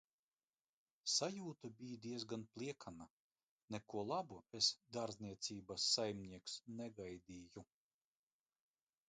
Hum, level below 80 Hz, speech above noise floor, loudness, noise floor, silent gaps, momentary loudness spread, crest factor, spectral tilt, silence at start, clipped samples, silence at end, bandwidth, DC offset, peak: none; -78 dBFS; over 44 dB; -44 LUFS; under -90 dBFS; 3.10-3.31 s, 3.43-3.68 s; 18 LU; 26 dB; -3 dB/octave; 1.05 s; under 0.1%; 1.45 s; 9.4 kHz; under 0.1%; -22 dBFS